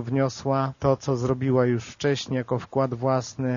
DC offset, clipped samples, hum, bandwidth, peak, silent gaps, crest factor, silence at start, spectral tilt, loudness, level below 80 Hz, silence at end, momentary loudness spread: under 0.1%; under 0.1%; none; 7.2 kHz; -8 dBFS; none; 18 dB; 0 s; -6.5 dB/octave; -25 LUFS; -54 dBFS; 0 s; 5 LU